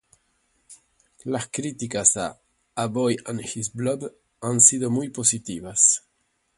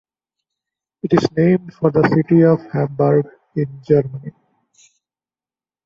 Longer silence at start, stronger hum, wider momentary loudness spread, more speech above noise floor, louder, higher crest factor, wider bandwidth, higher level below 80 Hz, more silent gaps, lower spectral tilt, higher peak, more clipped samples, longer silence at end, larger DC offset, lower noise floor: second, 0.7 s vs 1.05 s; neither; about the same, 17 LU vs 15 LU; second, 48 dB vs over 74 dB; second, -21 LUFS vs -17 LUFS; first, 24 dB vs 16 dB; first, 11.5 kHz vs 7.4 kHz; second, -60 dBFS vs -54 dBFS; neither; second, -3.5 dB/octave vs -9 dB/octave; about the same, -2 dBFS vs -2 dBFS; neither; second, 0.6 s vs 1.55 s; neither; second, -71 dBFS vs under -90 dBFS